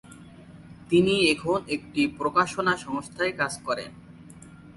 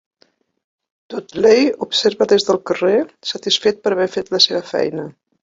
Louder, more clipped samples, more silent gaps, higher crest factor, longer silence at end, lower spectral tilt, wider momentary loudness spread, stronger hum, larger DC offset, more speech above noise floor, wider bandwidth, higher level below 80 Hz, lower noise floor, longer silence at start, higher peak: second, -25 LUFS vs -16 LUFS; neither; neither; about the same, 20 dB vs 16 dB; second, 0.05 s vs 0.3 s; about the same, -4.5 dB/octave vs -3.5 dB/octave; second, 10 LU vs 14 LU; neither; neither; second, 22 dB vs 43 dB; first, 11.5 kHz vs 7.8 kHz; about the same, -56 dBFS vs -60 dBFS; second, -47 dBFS vs -59 dBFS; second, 0.1 s vs 1.1 s; second, -8 dBFS vs 0 dBFS